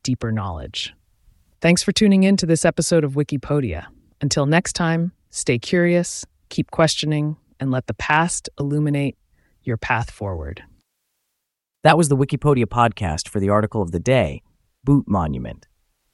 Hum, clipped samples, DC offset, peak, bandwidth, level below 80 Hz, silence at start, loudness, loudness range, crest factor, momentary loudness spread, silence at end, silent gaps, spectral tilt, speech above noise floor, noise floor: none; under 0.1%; under 0.1%; 0 dBFS; 12 kHz; -42 dBFS; 0.05 s; -20 LUFS; 4 LU; 20 dB; 12 LU; 0.6 s; none; -5 dB/octave; 61 dB; -80 dBFS